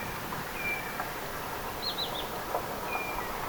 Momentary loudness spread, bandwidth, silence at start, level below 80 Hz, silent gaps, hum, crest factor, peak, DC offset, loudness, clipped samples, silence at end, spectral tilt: 4 LU; over 20 kHz; 0 s; -50 dBFS; none; none; 18 dB; -18 dBFS; under 0.1%; -34 LUFS; under 0.1%; 0 s; -3 dB/octave